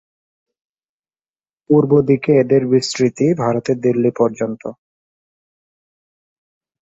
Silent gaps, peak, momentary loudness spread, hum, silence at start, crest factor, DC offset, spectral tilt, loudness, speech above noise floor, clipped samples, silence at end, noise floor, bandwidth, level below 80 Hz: none; -2 dBFS; 9 LU; none; 1.7 s; 16 dB; under 0.1%; -6.5 dB/octave; -16 LUFS; over 75 dB; under 0.1%; 2.1 s; under -90 dBFS; 8 kHz; -58 dBFS